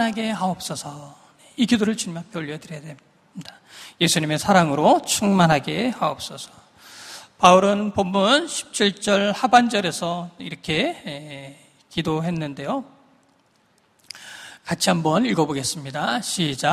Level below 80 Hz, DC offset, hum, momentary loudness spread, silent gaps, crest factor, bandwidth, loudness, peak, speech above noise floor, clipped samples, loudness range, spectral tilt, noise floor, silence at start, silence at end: -58 dBFS; under 0.1%; none; 22 LU; none; 22 dB; 15.5 kHz; -21 LUFS; 0 dBFS; 40 dB; under 0.1%; 9 LU; -4 dB/octave; -61 dBFS; 0 s; 0 s